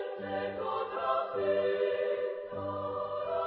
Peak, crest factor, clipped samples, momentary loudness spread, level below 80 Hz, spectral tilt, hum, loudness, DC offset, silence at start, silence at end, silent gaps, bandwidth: -18 dBFS; 16 dB; under 0.1%; 7 LU; -66 dBFS; -3.5 dB/octave; none; -33 LUFS; under 0.1%; 0 s; 0 s; none; 5.2 kHz